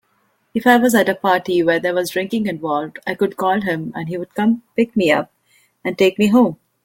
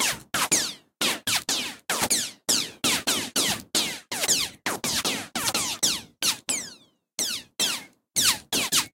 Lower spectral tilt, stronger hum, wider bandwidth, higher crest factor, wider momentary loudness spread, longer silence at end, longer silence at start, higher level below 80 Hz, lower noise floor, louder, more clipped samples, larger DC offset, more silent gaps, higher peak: first, -5.5 dB/octave vs 0 dB/octave; neither; about the same, 17 kHz vs 17 kHz; about the same, 18 dB vs 22 dB; first, 12 LU vs 6 LU; first, 0.3 s vs 0.05 s; first, 0.55 s vs 0 s; about the same, -60 dBFS vs -60 dBFS; first, -63 dBFS vs -52 dBFS; first, -18 LUFS vs -24 LUFS; neither; neither; neither; first, 0 dBFS vs -6 dBFS